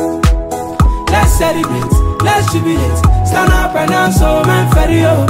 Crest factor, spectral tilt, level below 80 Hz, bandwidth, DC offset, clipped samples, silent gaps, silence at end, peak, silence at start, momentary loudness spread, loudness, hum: 10 dB; -5.5 dB/octave; -16 dBFS; 16.5 kHz; under 0.1%; under 0.1%; none; 0 s; 0 dBFS; 0 s; 3 LU; -12 LUFS; none